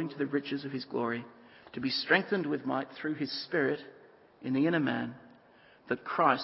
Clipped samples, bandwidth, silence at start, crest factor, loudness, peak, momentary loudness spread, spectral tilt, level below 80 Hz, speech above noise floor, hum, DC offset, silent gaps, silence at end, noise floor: under 0.1%; 5.8 kHz; 0 s; 22 dB; -32 LUFS; -10 dBFS; 14 LU; -9 dB/octave; -76 dBFS; 28 dB; none; under 0.1%; none; 0 s; -60 dBFS